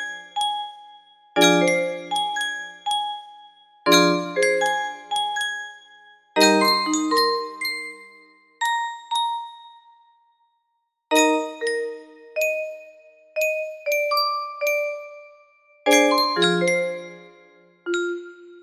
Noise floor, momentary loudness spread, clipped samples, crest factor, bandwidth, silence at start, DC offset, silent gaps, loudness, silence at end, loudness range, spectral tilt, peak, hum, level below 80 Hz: -74 dBFS; 18 LU; under 0.1%; 22 dB; 15.5 kHz; 0 s; under 0.1%; none; -22 LUFS; 0 s; 5 LU; -2.5 dB/octave; -2 dBFS; none; -74 dBFS